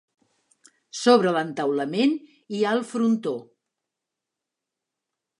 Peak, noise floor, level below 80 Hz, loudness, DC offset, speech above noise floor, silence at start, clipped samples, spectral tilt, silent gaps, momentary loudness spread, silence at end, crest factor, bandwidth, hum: -4 dBFS; -86 dBFS; -80 dBFS; -23 LUFS; under 0.1%; 63 dB; 0.95 s; under 0.1%; -5 dB/octave; none; 15 LU; 2 s; 22 dB; 11 kHz; none